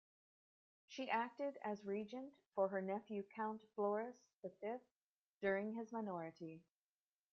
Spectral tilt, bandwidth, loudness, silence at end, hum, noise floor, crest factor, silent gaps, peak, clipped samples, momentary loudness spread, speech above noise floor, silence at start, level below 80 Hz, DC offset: -4.5 dB/octave; 7 kHz; -45 LUFS; 0.7 s; none; under -90 dBFS; 20 dB; 5.01-5.40 s; -26 dBFS; under 0.1%; 13 LU; over 45 dB; 0.9 s; -90 dBFS; under 0.1%